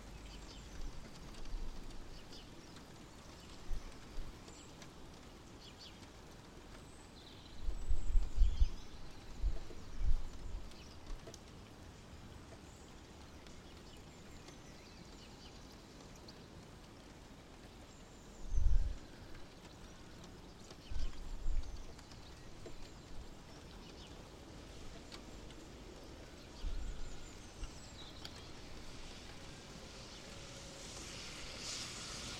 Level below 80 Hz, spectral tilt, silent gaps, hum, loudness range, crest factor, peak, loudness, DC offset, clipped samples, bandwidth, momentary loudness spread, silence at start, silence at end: -44 dBFS; -4 dB/octave; none; none; 12 LU; 24 dB; -16 dBFS; -49 LUFS; under 0.1%; under 0.1%; 11 kHz; 13 LU; 0 s; 0 s